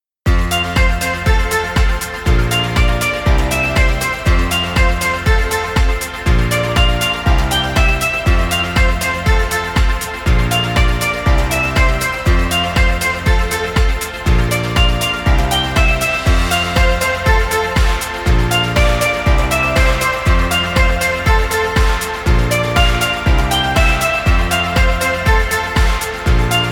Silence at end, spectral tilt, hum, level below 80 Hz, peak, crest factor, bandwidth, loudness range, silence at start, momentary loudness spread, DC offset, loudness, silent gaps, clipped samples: 0 s; -4.5 dB/octave; none; -16 dBFS; 0 dBFS; 14 dB; 18 kHz; 1 LU; 0.25 s; 3 LU; under 0.1%; -15 LUFS; none; under 0.1%